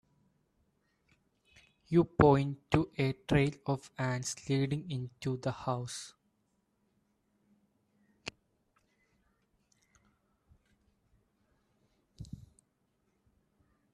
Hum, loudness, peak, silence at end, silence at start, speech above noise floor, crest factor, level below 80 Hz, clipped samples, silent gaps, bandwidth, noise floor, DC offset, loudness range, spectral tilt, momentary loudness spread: none; -32 LUFS; -10 dBFS; 1.55 s; 1.9 s; 46 dB; 26 dB; -58 dBFS; under 0.1%; none; 12.5 kHz; -77 dBFS; under 0.1%; 25 LU; -6.5 dB/octave; 23 LU